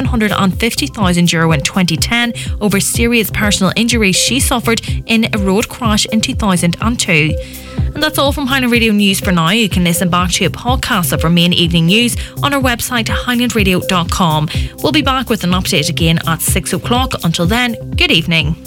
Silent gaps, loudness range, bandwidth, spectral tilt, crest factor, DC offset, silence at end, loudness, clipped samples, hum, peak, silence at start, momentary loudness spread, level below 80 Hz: none; 2 LU; 18 kHz; -4 dB/octave; 14 dB; under 0.1%; 0 s; -13 LUFS; under 0.1%; none; 0 dBFS; 0 s; 5 LU; -26 dBFS